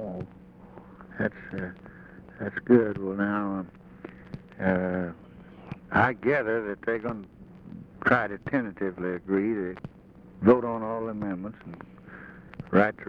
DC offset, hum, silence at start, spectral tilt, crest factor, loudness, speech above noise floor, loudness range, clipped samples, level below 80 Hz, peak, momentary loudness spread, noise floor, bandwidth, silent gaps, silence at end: under 0.1%; none; 0 s; -9.5 dB/octave; 22 dB; -27 LUFS; 24 dB; 2 LU; under 0.1%; -58 dBFS; -6 dBFS; 24 LU; -50 dBFS; 6 kHz; none; 0 s